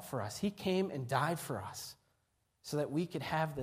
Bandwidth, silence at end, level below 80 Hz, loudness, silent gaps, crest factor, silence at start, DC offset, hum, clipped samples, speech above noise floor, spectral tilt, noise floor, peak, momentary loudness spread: 15.5 kHz; 0 s; -68 dBFS; -37 LUFS; none; 20 dB; 0 s; under 0.1%; none; under 0.1%; 42 dB; -5.5 dB/octave; -79 dBFS; -18 dBFS; 11 LU